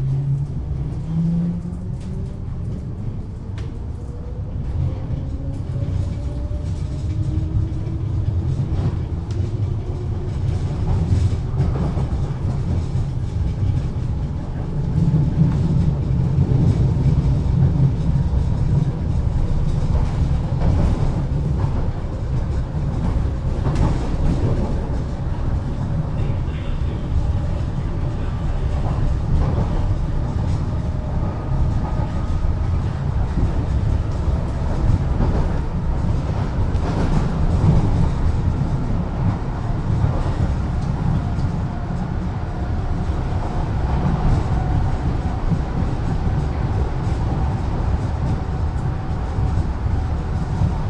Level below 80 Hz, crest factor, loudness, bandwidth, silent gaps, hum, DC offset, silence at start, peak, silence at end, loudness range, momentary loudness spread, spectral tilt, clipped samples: -24 dBFS; 16 dB; -22 LUFS; 9 kHz; none; none; under 0.1%; 0 s; -4 dBFS; 0 s; 5 LU; 7 LU; -8.5 dB/octave; under 0.1%